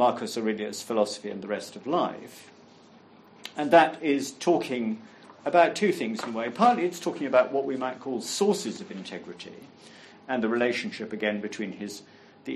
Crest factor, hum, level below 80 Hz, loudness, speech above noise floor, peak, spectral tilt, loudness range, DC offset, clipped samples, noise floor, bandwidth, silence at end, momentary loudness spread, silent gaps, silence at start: 22 dB; none; -78 dBFS; -27 LUFS; 27 dB; -4 dBFS; -4.5 dB/octave; 6 LU; under 0.1%; under 0.1%; -53 dBFS; 13 kHz; 0 s; 17 LU; none; 0 s